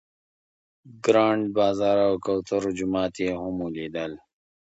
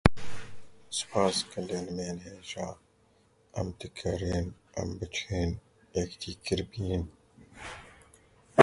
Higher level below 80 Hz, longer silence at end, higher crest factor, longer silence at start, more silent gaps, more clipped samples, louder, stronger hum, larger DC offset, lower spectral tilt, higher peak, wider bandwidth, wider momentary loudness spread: second, -58 dBFS vs -44 dBFS; first, 0.5 s vs 0 s; second, 20 dB vs 32 dB; first, 0.85 s vs 0.05 s; neither; neither; first, -25 LUFS vs -34 LUFS; neither; neither; about the same, -6 dB/octave vs -5 dB/octave; second, -4 dBFS vs 0 dBFS; second, 8.2 kHz vs 11.5 kHz; second, 11 LU vs 17 LU